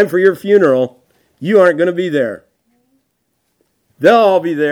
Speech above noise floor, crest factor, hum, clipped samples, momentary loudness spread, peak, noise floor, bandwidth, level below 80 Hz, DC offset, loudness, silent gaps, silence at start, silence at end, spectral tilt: 55 dB; 14 dB; none; under 0.1%; 12 LU; 0 dBFS; -67 dBFS; 17 kHz; -66 dBFS; under 0.1%; -12 LUFS; none; 0 s; 0 s; -6.5 dB/octave